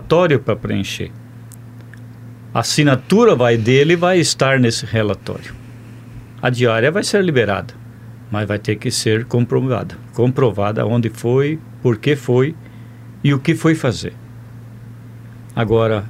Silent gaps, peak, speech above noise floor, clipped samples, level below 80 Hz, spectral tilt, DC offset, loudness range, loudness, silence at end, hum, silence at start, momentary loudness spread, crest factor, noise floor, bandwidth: none; 0 dBFS; 20 dB; under 0.1%; -48 dBFS; -5.5 dB/octave; under 0.1%; 5 LU; -16 LUFS; 0 s; none; 0 s; 24 LU; 16 dB; -36 dBFS; 15.5 kHz